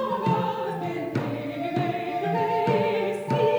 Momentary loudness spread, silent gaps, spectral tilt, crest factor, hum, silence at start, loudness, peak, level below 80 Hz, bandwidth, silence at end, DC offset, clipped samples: 6 LU; none; -7.5 dB/octave; 14 dB; none; 0 s; -26 LUFS; -10 dBFS; -66 dBFS; over 20 kHz; 0 s; under 0.1%; under 0.1%